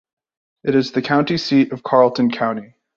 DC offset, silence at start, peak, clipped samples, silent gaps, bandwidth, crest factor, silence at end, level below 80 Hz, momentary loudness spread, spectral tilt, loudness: under 0.1%; 0.65 s; -2 dBFS; under 0.1%; none; 7.2 kHz; 16 dB; 0.3 s; -60 dBFS; 8 LU; -6.5 dB/octave; -18 LUFS